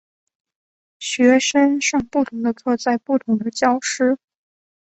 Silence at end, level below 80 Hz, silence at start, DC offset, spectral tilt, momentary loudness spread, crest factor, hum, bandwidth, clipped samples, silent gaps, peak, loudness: 0.7 s; -60 dBFS; 1 s; under 0.1%; -3 dB/octave; 8 LU; 18 dB; none; 8.4 kHz; under 0.1%; none; -2 dBFS; -19 LUFS